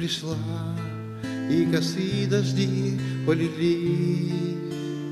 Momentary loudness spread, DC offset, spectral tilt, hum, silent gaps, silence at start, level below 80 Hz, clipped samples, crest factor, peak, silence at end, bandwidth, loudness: 8 LU; under 0.1%; -6.5 dB/octave; none; none; 0 s; -60 dBFS; under 0.1%; 16 dB; -10 dBFS; 0 s; 13.5 kHz; -26 LUFS